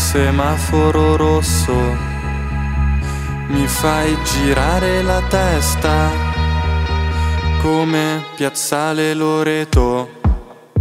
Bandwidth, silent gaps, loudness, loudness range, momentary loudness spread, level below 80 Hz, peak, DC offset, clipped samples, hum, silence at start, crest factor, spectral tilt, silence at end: 16 kHz; none; -17 LUFS; 2 LU; 6 LU; -22 dBFS; 0 dBFS; under 0.1%; under 0.1%; none; 0 s; 16 dB; -5 dB/octave; 0 s